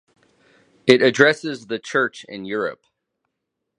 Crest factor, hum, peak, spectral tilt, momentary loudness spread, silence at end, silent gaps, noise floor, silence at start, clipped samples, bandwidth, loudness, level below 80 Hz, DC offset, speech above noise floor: 22 dB; none; 0 dBFS; -4.5 dB/octave; 14 LU; 1.05 s; none; -79 dBFS; 0.85 s; under 0.1%; 10.5 kHz; -19 LUFS; -68 dBFS; under 0.1%; 60 dB